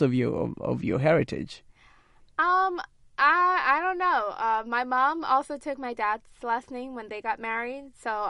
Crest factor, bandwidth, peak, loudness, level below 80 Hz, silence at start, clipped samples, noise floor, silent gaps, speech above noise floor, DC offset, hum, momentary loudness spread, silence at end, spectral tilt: 18 dB; 11.5 kHz; -10 dBFS; -26 LUFS; -58 dBFS; 0 s; under 0.1%; -57 dBFS; none; 31 dB; under 0.1%; none; 14 LU; 0 s; -6.5 dB/octave